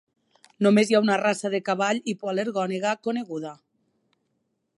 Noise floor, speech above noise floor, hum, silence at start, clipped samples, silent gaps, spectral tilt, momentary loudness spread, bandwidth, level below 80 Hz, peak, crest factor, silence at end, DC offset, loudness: -75 dBFS; 52 dB; none; 0.6 s; under 0.1%; none; -5 dB/octave; 11 LU; 11.5 kHz; -76 dBFS; -6 dBFS; 18 dB; 1.25 s; under 0.1%; -24 LUFS